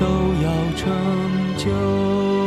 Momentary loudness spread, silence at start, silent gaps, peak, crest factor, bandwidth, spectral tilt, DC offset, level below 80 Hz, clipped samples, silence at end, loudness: 2 LU; 0 s; none; -8 dBFS; 12 dB; 13 kHz; -7 dB/octave; under 0.1%; -36 dBFS; under 0.1%; 0 s; -21 LUFS